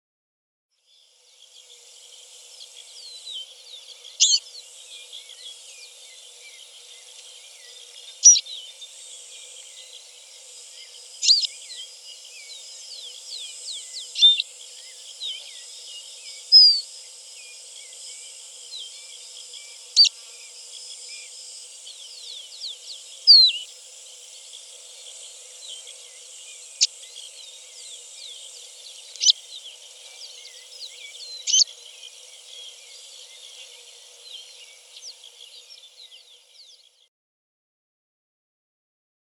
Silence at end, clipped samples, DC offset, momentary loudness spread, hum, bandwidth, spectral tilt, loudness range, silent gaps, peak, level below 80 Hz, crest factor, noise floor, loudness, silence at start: 4.2 s; under 0.1%; under 0.1%; 26 LU; none; 18.5 kHz; 11.5 dB/octave; 21 LU; none; -2 dBFS; under -90 dBFS; 24 dB; -59 dBFS; -17 LUFS; 3.05 s